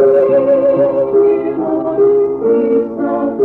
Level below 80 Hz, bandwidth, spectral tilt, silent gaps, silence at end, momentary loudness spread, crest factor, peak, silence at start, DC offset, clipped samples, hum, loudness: -52 dBFS; 3.3 kHz; -10 dB/octave; none; 0 s; 6 LU; 10 dB; -2 dBFS; 0 s; under 0.1%; under 0.1%; none; -13 LUFS